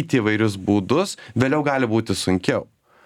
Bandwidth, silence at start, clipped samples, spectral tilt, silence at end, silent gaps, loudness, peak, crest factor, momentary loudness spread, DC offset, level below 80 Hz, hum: 15.5 kHz; 0 s; under 0.1%; -5.5 dB/octave; 0.4 s; none; -21 LUFS; -2 dBFS; 18 dB; 4 LU; under 0.1%; -56 dBFS; none